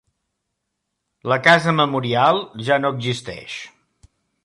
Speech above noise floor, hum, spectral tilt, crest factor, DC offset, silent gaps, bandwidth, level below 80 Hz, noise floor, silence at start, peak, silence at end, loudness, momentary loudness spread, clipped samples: 59 dB; none; -5 dB/octave; 18 dB; under 0.1%; none; 11.5 kHz; -60 dBFS; -77 dBFS; 1.25 s; -2 dBFS; 0.75 s; -18 LUFS; 18 LU; under 0.1%